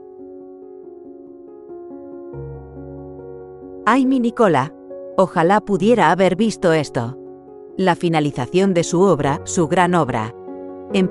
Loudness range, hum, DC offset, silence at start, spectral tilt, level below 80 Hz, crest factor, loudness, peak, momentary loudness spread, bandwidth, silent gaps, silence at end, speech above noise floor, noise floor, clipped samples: 18 LU; none; under 0.1%; 0 s; -6 dB/octave; -50 dBFS; 18 dB; -17 LUFS; -2 dBFS; 23 LU; 12 kHz; none; 0 s; 22 dB; -39 dBFS; under 0.1%